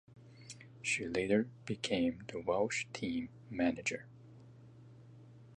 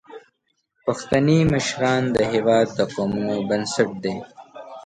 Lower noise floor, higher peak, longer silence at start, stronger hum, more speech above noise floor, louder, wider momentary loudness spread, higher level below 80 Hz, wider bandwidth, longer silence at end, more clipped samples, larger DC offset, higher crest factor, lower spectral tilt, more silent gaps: second, -57 dBFS vs -71 dBFS; second, -18 dBFS vs -4 dBFS; about the same, 0.1 s vs 0.1 s; neither; second, 21 dB vs 51 dB; second, -36 LUFS vs -21 LUFS; first, 24 LU vs 11 LU; second, -66 dBFS vs -50 dBFS; about the same, 11 kHz vs 11 kHz; about the same, 0.05 s vs 0.05 s; neither; neither; about the same, 20 dB vs 18 dB; about the same, -4.5 dB/octave vs -5.5 dB/octave; neither